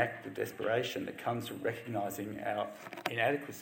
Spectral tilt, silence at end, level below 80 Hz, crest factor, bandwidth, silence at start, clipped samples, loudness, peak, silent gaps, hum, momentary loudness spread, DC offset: -5 dB/octave; 0 s; -74 dBFS; 24 dB; 17 kHz; 0 s; under 0.1%; -36 LUFS; -12 dBFS; none; none; 7 LU; under 0.1%